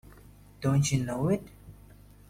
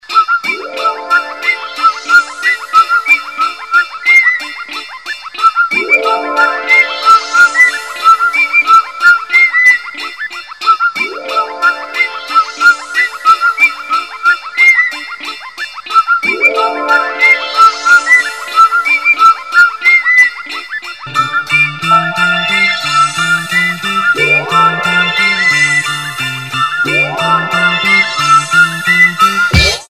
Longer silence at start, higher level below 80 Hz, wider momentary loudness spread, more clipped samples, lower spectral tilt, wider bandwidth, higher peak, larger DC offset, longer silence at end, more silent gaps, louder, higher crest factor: about the same, 0.1 s vs 0.1 s; second, -52 dBFS vs -36 dBFS; second, 7 LU vs 10 LU; second, under 0.1% vs 1%; first, -6 dB/octave vs -2.5 dB/octave; about the same, 16 kHz vs 15.5 kHz; second, -14 dBFS vs 0 dBFS; second, under 0.1% vs 0.4%; first, 0.6 s vs 0.05 s; neither; second, -29 LUFS vs -9 LUFS; first, 16 dB vs 10 dB